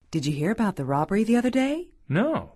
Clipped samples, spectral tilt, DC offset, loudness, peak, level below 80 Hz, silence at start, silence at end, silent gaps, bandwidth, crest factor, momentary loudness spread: under 0.1%; -6.5 dB/octave; under 0.1%; -25 LUFS; -10 dBFS; -54 dBFS; 0.1 s; 0.1 s; none; 13 kHz; 14 dB; 6 LU